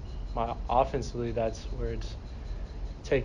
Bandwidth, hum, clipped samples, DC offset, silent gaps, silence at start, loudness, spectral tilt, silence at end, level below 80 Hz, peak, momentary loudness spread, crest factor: 9.6 kHz; none; under 0.1%; under 0.1%; none; 0 s; -33 LUFS; -6.5 dB/octave; 0 s; -38 dBFS; -12 dBFS; 14 LU; 20 dB